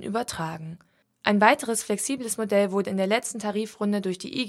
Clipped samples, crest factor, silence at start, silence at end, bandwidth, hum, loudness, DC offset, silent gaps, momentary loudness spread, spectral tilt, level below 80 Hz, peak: under 0.1%; 24 dB; 0 s; 0 s; 14.5 kHz; none; -25 LUFS; under 0.1%; none; 11 LU; -4 dB/octave; -66 dBFS; -2 dBFS